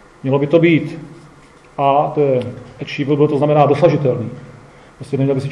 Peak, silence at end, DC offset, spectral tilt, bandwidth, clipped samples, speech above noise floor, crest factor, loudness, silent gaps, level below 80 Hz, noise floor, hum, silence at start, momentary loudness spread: 0 dBFS; 0 s; under 0.1%; -8.5 dB/octave; 10.5 kHz; under 0.1%; 29 dB; 16 dB; -15 LUFS; none; -54 dBFS; -44 dBFS; none; 0.25 s; 17 LU